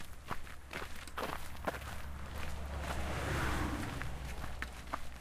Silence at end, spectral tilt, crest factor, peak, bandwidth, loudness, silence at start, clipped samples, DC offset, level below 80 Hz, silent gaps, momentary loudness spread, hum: 0 s; -5 dB/octave; 18 dB; -20 dBFS; 15.5 kHz; -42 LUFS; 0 s; under 0.1%; under 0.1%; -46 dBFS; none; 9 LU; none